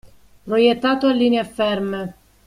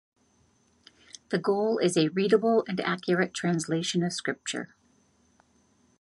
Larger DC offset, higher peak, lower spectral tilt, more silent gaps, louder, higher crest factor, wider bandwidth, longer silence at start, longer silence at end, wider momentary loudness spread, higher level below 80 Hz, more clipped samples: neither; first, -4 dBFS vs -10 dBFS; about the same, -6 dB/octave vs -5 dB/octave; neither; first, -19 LUFS vs -27 LUFS; about the same, 16 dB vs 20 dB; about the same, 12 kHz vs 11.5 kHz; second, 0.05 s vs 1.3 s; second, 0.35 s vs 1.35 s; about the same, 10 LU vs 11 LU; first, -54 dBFS vs -72 dBFS; neither